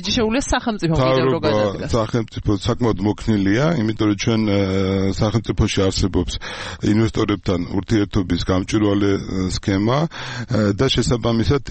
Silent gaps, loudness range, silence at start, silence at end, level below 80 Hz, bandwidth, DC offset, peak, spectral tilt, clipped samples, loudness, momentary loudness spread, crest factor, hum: none; 1 LU; 0 s; 0 s; -34 dBFS; 8.8 kHz; under 0.1%; -6 dBFS; -6 dB/octave; under 0.1%; -19 LUFS; 5 LU; 12 dB; none